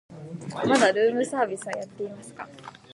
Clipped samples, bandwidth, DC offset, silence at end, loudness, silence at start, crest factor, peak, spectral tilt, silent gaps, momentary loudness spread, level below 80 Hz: under 0.1%; 11.5 kHz; under 0.1%; 0.25 s; -25 LUFS; 0.1 s; 18 dB; -8 dBFS; -4 dB/octave; none; 20 LU; -68 dBFS